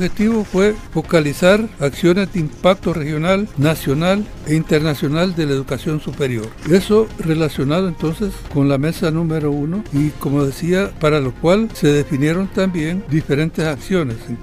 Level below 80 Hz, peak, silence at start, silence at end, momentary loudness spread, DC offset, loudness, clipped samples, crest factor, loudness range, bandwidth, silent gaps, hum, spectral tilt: -36 dBFS; -2 dBFS; 0 s; 0 s; 6 LU; under 0.1%; -17 LUFS; under 0.1%; 16 dB; 2 LU; 15.5 kHz; none; none; -6.5 dB/octave